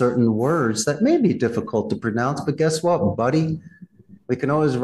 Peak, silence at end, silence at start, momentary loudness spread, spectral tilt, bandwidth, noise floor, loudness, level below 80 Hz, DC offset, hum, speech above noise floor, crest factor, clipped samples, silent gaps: -8 dBFS; 0 s; 0 s; 6 LU; -6 dB/octave; 12.5 kHz; -46 dBFS; -21 LUFS; -58 dBFS; under 0.1%; none; 26 dB; 12 dB; under 0.1%; none